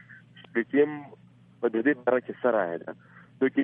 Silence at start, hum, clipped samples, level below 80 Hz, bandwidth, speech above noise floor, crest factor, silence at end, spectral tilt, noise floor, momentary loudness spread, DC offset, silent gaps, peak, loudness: 0.1 s; none; under 0.1%; -78 dBFS; 3.7 kHz; 24 dB; 18 dB; 0 s; -9.5 dB/octave; -51 dBFS; 14 LU; under 0.1%; none; -10 dBFS; -27 LUFS